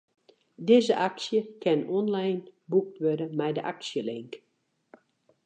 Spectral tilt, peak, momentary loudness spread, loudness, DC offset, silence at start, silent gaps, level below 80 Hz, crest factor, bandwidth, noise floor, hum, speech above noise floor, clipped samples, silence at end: -6 dB/octave; -8 dBFS; 13 LU; -28 LUFS; under 0.1%; 0.6 s; none; -84 dBFS; 20 dB; 9.2 kHz; -67 dBFS; none; 40 dB; under 0.1%; 1.1 s